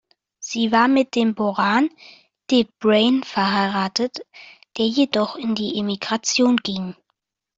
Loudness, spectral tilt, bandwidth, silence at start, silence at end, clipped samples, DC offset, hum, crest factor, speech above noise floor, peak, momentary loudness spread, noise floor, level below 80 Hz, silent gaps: -20 LUFS; -4 dB/octave; 7.8 kHz; 0.4 s; 0.65 s; under 0.1%; under 0.1%; none; 18 dB; 56 dB; -4 dBFS; 10 LU; -75 dBFS; -62 dBFS; none